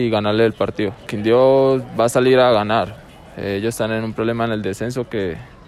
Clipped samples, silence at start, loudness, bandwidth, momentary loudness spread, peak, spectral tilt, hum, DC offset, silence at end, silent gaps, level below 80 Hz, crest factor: under 0.1%; 0 s; -18 LUFS; 14 kHz; 11 LU; -4 dBFS; -6 dB/octave; none; under 0.1%; 0.2 s; none; -48 dBFS; 14 dB